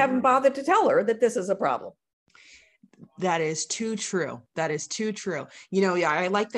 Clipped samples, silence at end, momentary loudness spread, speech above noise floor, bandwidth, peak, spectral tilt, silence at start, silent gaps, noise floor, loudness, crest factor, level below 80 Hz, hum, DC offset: under 0.1%; 0 s; 11 LU; 31 dB; 12 kHz; -8 dBFS; -4 dB/octave; 0 s; 2.13-2.26 s; -56 dBFS; -25 LUFS; 18 dB; -72 dBFS; none; under 0.1%